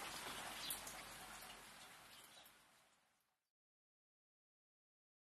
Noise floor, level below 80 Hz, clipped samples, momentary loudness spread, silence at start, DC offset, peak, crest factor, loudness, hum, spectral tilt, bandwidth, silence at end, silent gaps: -84 dBFS; -78 dBFS; under 0.1%; 16 LU; 0 s; under 0.1%; -30 dBFS; 26 dB; -51 LUFS; none; -0.5 dB/octave; 13 kHz; 2.35 s; none